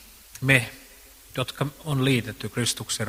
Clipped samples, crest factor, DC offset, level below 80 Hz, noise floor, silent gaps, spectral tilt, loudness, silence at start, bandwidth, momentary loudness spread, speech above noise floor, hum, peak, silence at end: under 0.1%; 24 dB; under 0.1%; -54 dBFS; -49 dBFS; none; -4 dB/octave; -25 LUFS; 0 s; 16 kHz; 16 LU; 24 dB; none; -2 dBFS; 0 s